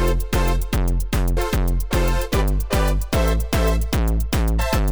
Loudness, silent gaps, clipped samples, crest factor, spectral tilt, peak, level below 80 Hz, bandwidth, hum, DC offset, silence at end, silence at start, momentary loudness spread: -22 LUFS; none; under 0.1%; 12 dB; -5.5 dB/octave; -8 dBFS; -20 dBFS; over 20 kHz; none; under 0.1%; 0 s; 0 s; 2 LU